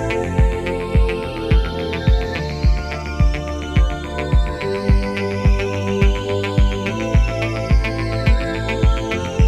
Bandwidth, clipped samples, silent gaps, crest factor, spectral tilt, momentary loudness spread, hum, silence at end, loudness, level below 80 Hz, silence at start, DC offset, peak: 10.5 kHz; under 0.1%; none; 14 dB; -6.5 dB/octave; 4 LU; none; 0 s; -20 LUFS; -20 dBFS; 0 s; under 0.1%; -2 dBFS